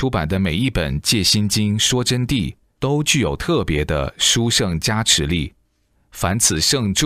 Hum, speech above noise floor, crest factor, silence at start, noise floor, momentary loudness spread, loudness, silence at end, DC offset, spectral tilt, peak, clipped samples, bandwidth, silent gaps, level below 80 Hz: none; 44 dB; 18 dB; 0 s; -62 dBFS; 8 LU; -18 LUFS; 0 s; under 0.1%; -3.5 dB/octave; 0 dBFS; under 0.1%; 16 kHz; none; -34 dBFS